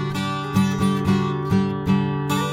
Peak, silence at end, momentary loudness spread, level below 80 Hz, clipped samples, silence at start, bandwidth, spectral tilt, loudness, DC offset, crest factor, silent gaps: -6 dBFS; 0 s; 3 LU; -44 dBFS; under 0.1%; 0 s; 16 kHz; -6.5 dB/octave; -21 LUFS; under 0.1%; 14 dB; none